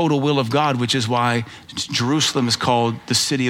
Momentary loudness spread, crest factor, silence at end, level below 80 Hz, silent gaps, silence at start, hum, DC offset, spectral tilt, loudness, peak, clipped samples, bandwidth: 6 LU; 16 dB; 0 s; -58 dBFS; none; 0 s; none; under 0.1%; -4 dB/octave; -19 LUFS; -4 dBFS; under 0.1%; 16.5 kHz